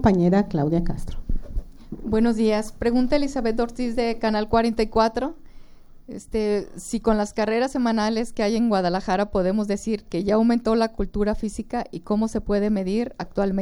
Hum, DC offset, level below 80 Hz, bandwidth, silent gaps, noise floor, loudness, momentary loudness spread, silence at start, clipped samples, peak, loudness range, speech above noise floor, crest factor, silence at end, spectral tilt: none; under 0.1%; -36 dBFS; 12 kHz; none; -43 dBFS; -23 LUFS; 11 LU; 0 s; under 0.1%; -6 dBFS; 2 LU; 21 dB; 18 dB; 0 s; -6.5 dB/octave